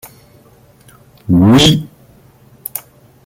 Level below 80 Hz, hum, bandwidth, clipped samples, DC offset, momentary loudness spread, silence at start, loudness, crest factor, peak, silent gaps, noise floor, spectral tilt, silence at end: -40 dBFS; none; 17 kHz; under 0.1%; under 0.1%; 24 LU; 1.3 s; -10 LUFS; 16 dB; 0 dBFS; none; -46 dBFS; -5.5 dB/octave; 0.45 s